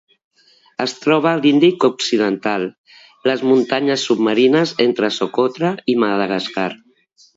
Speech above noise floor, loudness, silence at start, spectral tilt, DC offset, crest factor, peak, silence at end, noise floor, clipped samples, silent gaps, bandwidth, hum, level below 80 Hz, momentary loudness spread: 37 dB; -17 LUFS; 0.8 s; -5 dB/octave; under 0.1%; 16 dB; -2 dBFS; 0.6 s; -53 dBFS; under 0.1%; 2.78-2.84 s; 8 kHz; none; -68 dBFS; 10 LU